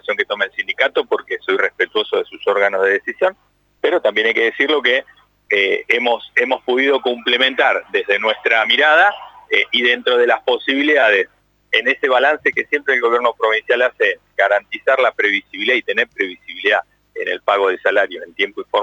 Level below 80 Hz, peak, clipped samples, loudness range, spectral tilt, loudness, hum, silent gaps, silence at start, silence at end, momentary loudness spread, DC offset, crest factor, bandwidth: -66 dBFS; -2 dBFS; under 0.1%; 3 LU; -3 dB/octave; -16 LUFS; 50 Hz at -65 dBFS; none; 0.1 s; 0 s; 7 LU; under 0.1%; 16 dB; 8 kHz